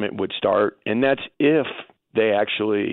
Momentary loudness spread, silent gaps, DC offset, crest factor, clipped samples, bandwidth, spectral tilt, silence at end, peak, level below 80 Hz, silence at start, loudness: 7 LU; none; under 0.1%; 14 dB; under 0.1%; 4.2 kHz; -10 dB/octave; 0 s; -6 dBFS; -64 dBFS; 0 s; -21 LUFS